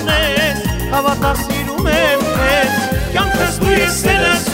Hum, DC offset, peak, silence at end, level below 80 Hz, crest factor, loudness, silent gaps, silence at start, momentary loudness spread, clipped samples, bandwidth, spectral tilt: none; 0.2%; -2 dBFS; 0 s; -26 dBFS; 14 dB; -14 LUFS; none; 0 s; 5 LU; under 0.1%; 16.5 kHz; -4 dB/octave